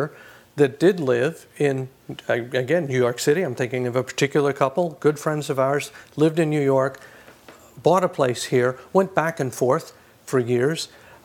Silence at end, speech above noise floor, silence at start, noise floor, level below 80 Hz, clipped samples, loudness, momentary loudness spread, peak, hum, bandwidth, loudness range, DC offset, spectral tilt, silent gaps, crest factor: 0.4 s; 26 dB; 0 s; -47 dBFS; -68 dBFS; under 0.1%; -22 LUFS; 7 LU; 0 dBFS; none; 17.5 kHz; 1 LU; under 0.1%; -5.5 dB/octave; none; 22 dB